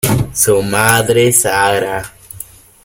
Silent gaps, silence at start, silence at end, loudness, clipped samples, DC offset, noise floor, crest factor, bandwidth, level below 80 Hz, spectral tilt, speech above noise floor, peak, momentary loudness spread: none; 0.05 s; 0.4 s; -12 LUFS; under 0.1%; under 0.1%; -34 dBFS; 14 dB; over 20 kHz; -38 dBFS; -3.5 dB/octave; 22 dB; 0 dBFS; 20 LU